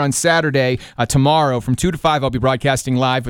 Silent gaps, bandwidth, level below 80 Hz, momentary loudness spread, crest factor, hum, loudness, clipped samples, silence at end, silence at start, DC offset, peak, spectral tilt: none; 17 kHz; -38 dBFS; 4 LU; 14 dB; none; -16 LUFS; under 0.1%; 0 s; 0 s; under 0.1%; -2 dBFS; -5 dB/octave